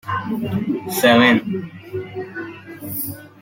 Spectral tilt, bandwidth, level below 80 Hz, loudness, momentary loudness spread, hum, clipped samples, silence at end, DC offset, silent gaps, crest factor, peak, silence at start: -4.5 dB/octave; 17 kHz; -58 dBFS; -19 LUFS; 18 LU; none; under 0.1%; 0.15 s; under 0.1%; none; 18 dB; -2 dBFS; 0.05 s